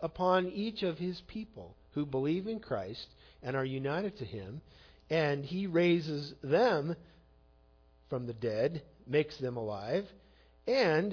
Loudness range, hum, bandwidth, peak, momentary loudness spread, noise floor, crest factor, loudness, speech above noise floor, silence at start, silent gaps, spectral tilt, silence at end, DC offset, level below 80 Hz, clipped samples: 5 LU; none; 5.4 kHz; -16 dBFS; 16 LU; -64 dBFS; 18 dB; -34 LUFS; 31 dB; 0 s; none; -5 dB/octave; 0 s; under 0.1%; -62 dBFS; under 0.1%